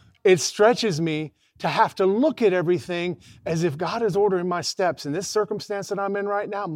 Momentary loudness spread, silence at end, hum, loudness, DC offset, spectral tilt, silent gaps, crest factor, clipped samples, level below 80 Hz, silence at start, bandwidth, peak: 10 LU; 0 s; none; -23 LUFS; under 0.1%; -5 dB/octave; none; 18 dB; under 0.1%; -64 dBFS; 0.25 s; 15.5 kHz; -6 dBFS